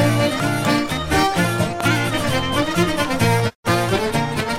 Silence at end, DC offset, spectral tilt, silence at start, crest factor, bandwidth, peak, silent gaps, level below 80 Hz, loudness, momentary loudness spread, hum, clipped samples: 0 s; under 0.1%; -5 dB/octave; 0 s; 14 dB; 16 kHz; -4 dBFS; 3.55-3.63 s; -40 dBFS; -19 LUFS; 2 LU; none; under 0.1%